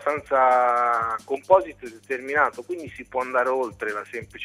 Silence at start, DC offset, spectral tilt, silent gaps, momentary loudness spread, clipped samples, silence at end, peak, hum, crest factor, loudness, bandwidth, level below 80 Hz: 0 s; under 0.1%; -5 dB/octave; none; 15 LU; under 0.1%; 0 s; -4 dBFS; 50 Hz at -60 dBFS; 20 dB; -23 LUFS; 14 kHz; -60 dBFS